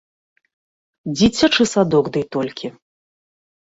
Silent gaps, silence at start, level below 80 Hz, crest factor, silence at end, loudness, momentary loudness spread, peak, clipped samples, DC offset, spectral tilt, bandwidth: none; 1.05 s; -50 dBFS; 18 dB; 1.05 s; -17 LUFS; 17 LU; -2 dBFS; under 0.1%; under 0.1%; -4.5 dB/octave; 8 kHz